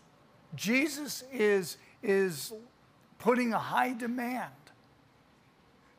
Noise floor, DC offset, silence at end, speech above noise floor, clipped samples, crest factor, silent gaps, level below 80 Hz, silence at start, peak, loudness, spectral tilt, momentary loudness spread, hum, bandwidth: -63 dBFS; under 0.1%; 1.45 s; 32 dB; under 0.1%; 20 dB; none; -76 dBFS; 0.5 s; -12 dBFS; -31 LUFS; -4 dB/octave; 13 LU; none; 15.5 kHz